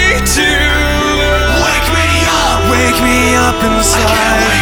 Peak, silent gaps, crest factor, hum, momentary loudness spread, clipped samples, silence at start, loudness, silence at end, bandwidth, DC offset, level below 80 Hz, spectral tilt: 0 dBFS; none; 10 dB; none; 2 LU; under 0.1%; 0 s; -10 LUFS; 0 s; over 20 kHz; under 0.1%; -18 dBFS; -3.5 dB/octave